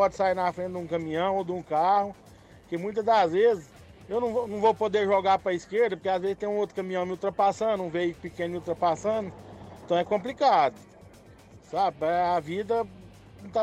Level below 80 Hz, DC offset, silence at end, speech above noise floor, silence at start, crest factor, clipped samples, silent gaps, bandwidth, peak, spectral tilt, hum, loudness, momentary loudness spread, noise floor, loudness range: -60 dBFS; under 0.1%; 0 s; 25 dB; 0 s; 16 dB; under 0.1%; none; 12 kHz; -10 dBFS; -6 dB/octave; none; -27 LUFS; 10 LU; -51 dBFS; 3 LU